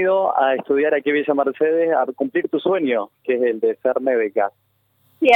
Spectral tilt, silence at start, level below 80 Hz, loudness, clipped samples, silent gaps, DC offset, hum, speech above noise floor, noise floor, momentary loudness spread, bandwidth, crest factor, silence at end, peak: -6.5 dB/octave; 0 s; -74 dBFS; -20 LUFS; under 0.1%; none; under 0.1%; none; 43 dB; -62 dBFS; 5 LU; 4.5 kHz; 16 dB; 0 s; -2 dBFS